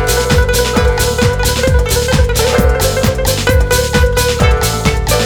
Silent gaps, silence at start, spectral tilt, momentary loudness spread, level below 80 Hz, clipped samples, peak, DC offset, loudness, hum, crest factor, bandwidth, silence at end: none; 0 s; -4 dB/octave; 2 LU; -16 dBFS; under 0.1%; 0 dBFS; under 0.1%; -12 LUFS; none; 12 dB; over 20 kHz; 0 s